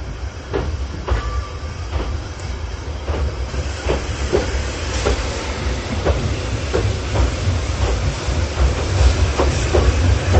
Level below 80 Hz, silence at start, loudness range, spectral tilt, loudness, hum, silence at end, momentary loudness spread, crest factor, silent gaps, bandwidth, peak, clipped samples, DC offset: -22 dBFS; 0 s; 6 LU; -5.5 dB/octave; -21 LUFS; none; 0 s; 11 LU; 18 dB; none; 8.6 kHz; -2 dBFS; under 0.1%; under 0.1%